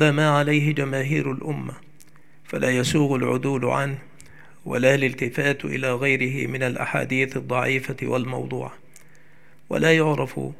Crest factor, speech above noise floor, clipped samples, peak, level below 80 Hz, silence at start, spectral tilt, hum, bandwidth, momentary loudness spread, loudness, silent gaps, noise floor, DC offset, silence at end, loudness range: 20 dB; 33 dB; under 0.1%; -2 dBFS; -60 dBFS; 0 s; -6 dB/octave; none; 15 kHz; 11 LU; -23 LUFS; none; -55 dBFS; 0.7%; 0.05 s; 3 LU